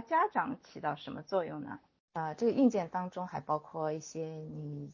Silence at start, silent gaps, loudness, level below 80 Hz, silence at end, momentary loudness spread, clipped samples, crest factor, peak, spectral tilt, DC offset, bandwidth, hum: 0 s; 2.00-2.08 s; -35 LUFS; -74 dBFS; 0 s; 14 LU; under 0.1%; 18 dB; -16 dBFS; -6.5 dB/octave; under 0.1%; 7.4 kHz; none